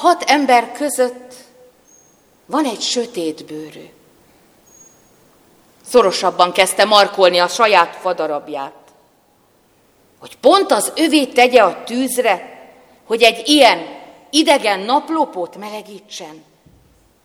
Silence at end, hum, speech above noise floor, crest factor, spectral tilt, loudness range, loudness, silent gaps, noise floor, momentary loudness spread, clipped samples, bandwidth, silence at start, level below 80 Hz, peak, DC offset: 0.85 s; none; 40 dB; 16 dB; -2 dB/octave; 10 LU; -14 LUFS; none; -55 dBFS; 20 LU; under 0.1%; 18.5 kHz; 0 s; -62 dBFS; 0 dBFS; under 0.1%